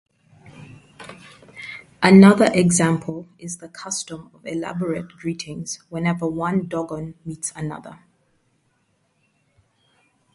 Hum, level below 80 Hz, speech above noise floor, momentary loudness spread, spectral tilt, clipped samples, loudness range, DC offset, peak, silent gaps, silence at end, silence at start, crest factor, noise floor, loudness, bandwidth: none; -58 dBFS; 47 dB; 23 LU; -5.5 dB/octave; under 0.1%; 14 LU; under 0.1%; 0 dBFS; none; 2.4 s; 0.6 s; 22 dB; -67 dBFS; -20 LUFS; 11.5 kHz